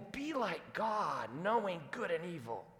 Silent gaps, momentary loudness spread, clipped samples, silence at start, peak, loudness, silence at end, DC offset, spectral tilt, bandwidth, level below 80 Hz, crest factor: none; 6 LU; under 0.1%; 0 s; -22 dBFS; -38 LUFS; 0 s; under 0.1%; -5.5 dB/octave; 17.5 kHz; -74 dBFS; 18 dB